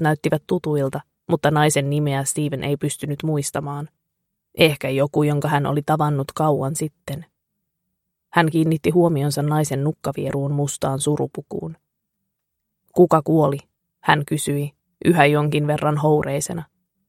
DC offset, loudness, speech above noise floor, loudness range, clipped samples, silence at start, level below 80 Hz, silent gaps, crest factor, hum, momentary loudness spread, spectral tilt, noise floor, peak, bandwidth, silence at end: under 0.1%; -20 LUFS; 58 dB; 4 LU; under 0.1%; 0 s; -56 dBFS; none; 20 dB; none; 13 LU; -5.5 dB/octave; -78 dBFS; 0 dBFS; 15.5 kHz; 0.45 s